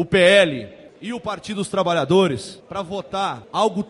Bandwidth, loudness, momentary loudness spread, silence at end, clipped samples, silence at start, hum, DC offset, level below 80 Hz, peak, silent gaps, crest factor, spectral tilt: 11.5 kHz; -20 LUFS; 18 LU; 0.05 s; under 0.1%; 0 s; none; under 0.1%; -54 dBFS; -4 dBFS; none; 16 dB; -5 dB/octave